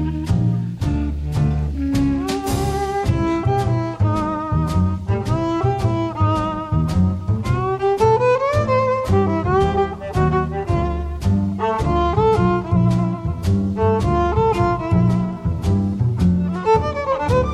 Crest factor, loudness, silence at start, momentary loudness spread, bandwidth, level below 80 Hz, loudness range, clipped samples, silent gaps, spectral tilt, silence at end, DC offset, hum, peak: 14 dB; -19 LUFS; 0 s; 5 LU; 14 kHz; -30 dBFS; 2 LU; under 0.1%; none; -8 dB/octave; 0 s; under 0.1%; none; -4 dBFS